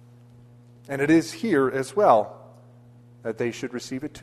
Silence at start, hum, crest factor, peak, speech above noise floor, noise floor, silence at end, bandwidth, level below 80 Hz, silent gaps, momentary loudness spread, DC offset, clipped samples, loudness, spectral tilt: 0.9 s; none; 20 dB; -4 dBFS; 27 dB; -50 dBFS; 0.05 s; 13 kHz; -64 dBFS; none; 15 LU; under 0.1%; under 0.1%; -23 LUFS; -6 dB/octave